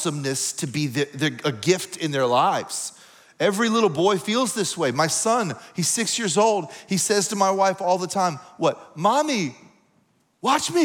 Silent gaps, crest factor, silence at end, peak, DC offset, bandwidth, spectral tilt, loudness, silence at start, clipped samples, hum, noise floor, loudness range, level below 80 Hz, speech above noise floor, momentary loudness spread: none; 18 dB; 0 s; -4 dBFS; under 0.1%; 20 kHz; -3.5 dB/octave; -22 LUFS; 0 s; under 0.1%; none; -64 dBFS; 2 LU; -72 dBFS; 42 dB; 6 LU